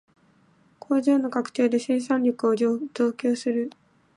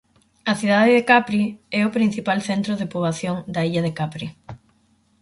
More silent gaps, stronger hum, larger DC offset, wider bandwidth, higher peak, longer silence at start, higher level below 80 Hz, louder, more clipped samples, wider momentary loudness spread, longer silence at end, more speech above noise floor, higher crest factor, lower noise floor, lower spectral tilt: neither; neither; neither; about the same, 11.5 kHz vs 11.5 kHz; second, -10 dBFS vs -2 dBFS; first, 0.9 s vs 0.45 s; second, -78 dBFS vs -58 dBFS; second, -24 LUFS vs -20 LUFS; neither; second, 5 LU vs 12 LU; second, 0.45 s vs 0.65 s; second, 37 dB vs 41 dB; about the same, 14 dB vs 18 dB; about the same, -60 dBFS vs -61 dBFS; about the same, -5.5 dB/octave vs -6 dB/octave